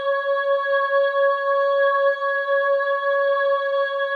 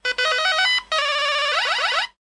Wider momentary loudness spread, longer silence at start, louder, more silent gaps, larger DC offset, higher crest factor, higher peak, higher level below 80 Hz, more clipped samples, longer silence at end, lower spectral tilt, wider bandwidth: about the same, 3 LU vs 3 LU; about the same, 0 s vs 0.05 s; about the same, -20 LUFS vs -19 LUFS; neither; neither; about the same, 10 dB vs 14 dB; second, -10 dBFS vs -6 dBFS; second, under -90 dBFS vs -58 dBFS; neither; second, 0 s vs 0.15 s; first, 0.5 dB/octave vs 2 dB/octave; second, 4.7 kHz vs 11.5 kHz